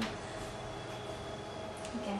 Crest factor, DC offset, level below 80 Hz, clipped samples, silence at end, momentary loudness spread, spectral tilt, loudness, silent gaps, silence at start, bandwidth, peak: 16 dB; under 0.1%; -56 dBFS; under 0.1%; 0 s; 3 LU; -4.5 dB/octave; -42 LUFS; none; 0 s; 12.5 kHz; -24 dBFS